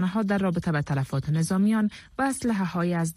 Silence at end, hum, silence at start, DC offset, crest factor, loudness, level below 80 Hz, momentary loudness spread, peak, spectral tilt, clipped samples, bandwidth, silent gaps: 0.05 s; none; 0 s; under 0.1%; 10 dB; -26 LUFS; -54 dBFS; 5 LU; -14 dBFS; -6.5 dB/octave; under 0.1%; 14 kHz; none